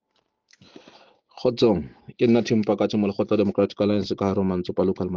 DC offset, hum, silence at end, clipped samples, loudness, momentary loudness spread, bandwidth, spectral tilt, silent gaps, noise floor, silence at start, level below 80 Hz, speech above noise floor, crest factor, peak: under 0.1%; none; 0 s; under 0.1%; -23 LUFS; 5 LU; 7.2 kHz; -7.5 dB/octave; none; -71 dBFS; 1.35 s; -56 dBFS; 50 dB; 16 dB; -6 dBFS